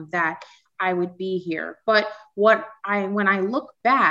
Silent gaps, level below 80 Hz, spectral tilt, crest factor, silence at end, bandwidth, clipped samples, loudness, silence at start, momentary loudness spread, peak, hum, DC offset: none; -78 dBFS; -6.5 dB/octave; 18 dB; 0 s; 7.6 kHz; under 0.1%; -22 LUFS; 0 s; 9 LU; -6 dBFS; none; under 0.1%